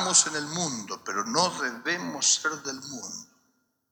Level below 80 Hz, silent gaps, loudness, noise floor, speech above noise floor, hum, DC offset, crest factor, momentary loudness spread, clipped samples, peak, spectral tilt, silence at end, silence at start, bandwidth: -78 dBFS; none; -26 LUFS; -72 dBFS; 43 dB; none; under 0.1%; 22 dB; 15 LU; under 0.1%; -6 dBFS; -1 dB/octave; 0.65 s; 0 s; over 20 kHz